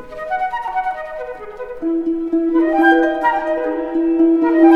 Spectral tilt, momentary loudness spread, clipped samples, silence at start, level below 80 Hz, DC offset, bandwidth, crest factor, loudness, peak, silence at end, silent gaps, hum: -6 dB/octave; 15 LU; under 0.1%; 0 s; -48 dBFS; under 0.1%; 4.7 kHz; 16 dB; -17 LUFS; 0 dBFS; 0 s; none; none